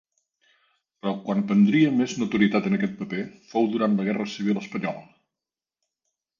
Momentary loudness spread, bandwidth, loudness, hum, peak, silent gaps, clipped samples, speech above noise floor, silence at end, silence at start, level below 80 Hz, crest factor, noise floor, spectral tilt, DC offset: 12 LU; 7.2 kHz; -24 LUFS; none; -8 dBFS; none; under 0.1%; 66 dB; 1.35 s; 1.05 s; -66 dBFS; 18 dB; -90 dBFS; -6.5 dB/octave; under 0.1%